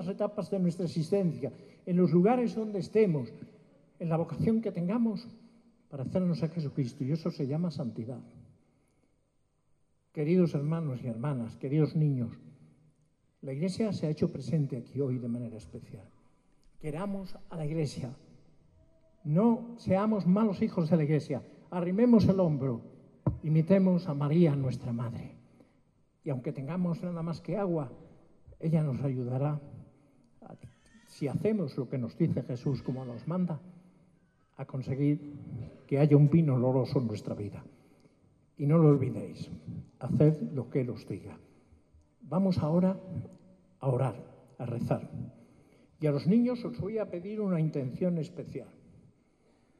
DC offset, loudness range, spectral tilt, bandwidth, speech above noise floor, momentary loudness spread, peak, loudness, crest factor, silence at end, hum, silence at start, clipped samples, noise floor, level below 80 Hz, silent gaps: under 0.1%; 8 LU; -9.5 dB/octave; 11 kHz; 43 dB; 17 LU; -8 dBFS; -30 LUFS; 22 dB; 1.15 s; none; 0 s; under 0.1%; -72 dBFS; -62 dBFS; none